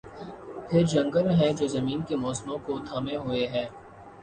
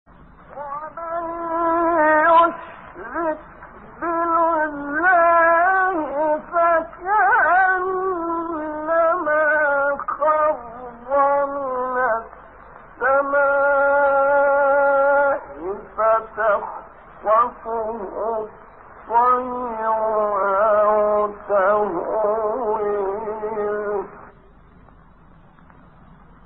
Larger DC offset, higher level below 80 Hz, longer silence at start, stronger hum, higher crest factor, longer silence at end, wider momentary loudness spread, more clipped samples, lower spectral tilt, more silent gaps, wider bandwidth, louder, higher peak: second, under 0.1% vs 0.1%; about the same, -56 dBFS vs -52 dBFS; second, 0.05 s vs 0.5 s; neither; about the same, 18 dB vs 14 dB; second, 0 s vs 2.15 s; first, 17 LU vs 13 LU; neither; first, -6.5 dB/octave vs -3 dB/octave; neither; first, 9.8 kHz vs 4 kHz; second, -27 LUFS vs -19 LUFS; second, -10 dBFS vs -6 dBFS